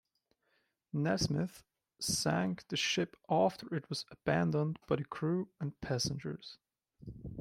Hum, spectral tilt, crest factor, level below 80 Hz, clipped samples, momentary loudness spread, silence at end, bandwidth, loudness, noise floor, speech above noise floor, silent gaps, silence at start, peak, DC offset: none; -4.5 dB/octave; 18 dB; -62 dBFS; under 0.1%; 12 LU; 0 s; 16 kHz; -35 LUFS; -79 dBFS; 44 dB; none; 0.95 s; -18 dBFS; under 0.1%